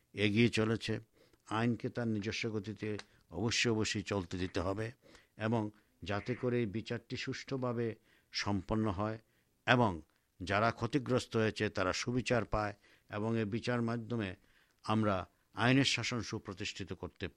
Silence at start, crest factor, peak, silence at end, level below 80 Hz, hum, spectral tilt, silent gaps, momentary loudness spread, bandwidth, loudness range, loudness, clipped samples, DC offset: 0.15 s; 26 dB; -10 dBFS; 0.05 s; -60 dBFS; none; -5 dB/octave; none; 13 LU; 11.5 kHz; 4 LU; -35 LUFS; under 0.1%; under 0.1%